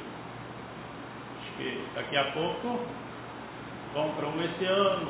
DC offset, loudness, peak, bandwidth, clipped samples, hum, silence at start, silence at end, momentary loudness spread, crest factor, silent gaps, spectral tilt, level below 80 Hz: under 0.1%; -33 LUFS; -12 dBFS; 4 kHz; under 0.1%; none; 0 s; 0 s; 14 LU; 20 dB; none; -3 dB/octave; -62 dBFS